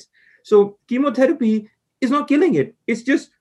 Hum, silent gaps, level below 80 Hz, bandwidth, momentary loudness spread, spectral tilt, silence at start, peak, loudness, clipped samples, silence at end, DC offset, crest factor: none; none; -72 dBFS; 11 kHz; 8 LU; -6.5 dB/octave; 0.45 s; -4 dBFS; -19 LUFS; under 0.1%; 0.15 s; under 0.1%; 16 dB